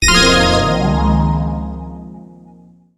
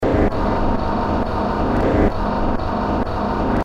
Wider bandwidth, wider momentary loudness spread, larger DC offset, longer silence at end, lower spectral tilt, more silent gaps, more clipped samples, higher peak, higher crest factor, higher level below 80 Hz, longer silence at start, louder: first, 16 kHz vs 8 kHz; first, 22 LU vs 4 LU; second, under 0.1% vs 0.9%; first, 0.65 s vs 0 s; second, -4 dB/octave vs -8.5 dB/octave; neither; neither; first, 0 dBFS vs -4 dBFS; about the same, 16 dB vs 14 dB; about the same, -24 dBFS vs -24 dBFS; about the same, 0 s vs 0 s; first, -13 LUFS vs -20 LUFS